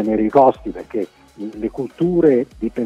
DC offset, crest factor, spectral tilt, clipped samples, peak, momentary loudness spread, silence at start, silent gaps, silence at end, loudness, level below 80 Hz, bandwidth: under 0.1%; 16 dB; -9 dB/octave; under 0.1%; -2 dBFS; 16 LU; 0 s; none; 0 s; -18 LUFS; -46 dBFS; 8 kHz